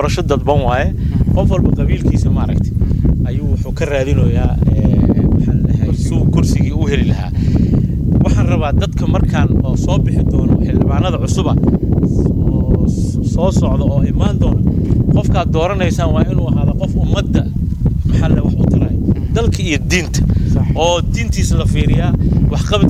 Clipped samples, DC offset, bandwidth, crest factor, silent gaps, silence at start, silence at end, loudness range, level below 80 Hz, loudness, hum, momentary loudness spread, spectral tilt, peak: under 0.1%; under 0.1%; 13 kHz; 12 dB; none; 0 s; 0 s; 1 LU; -18 dBFS; -14 LUFS; none; 3 LU; -7 dB/octave; 0 dBFS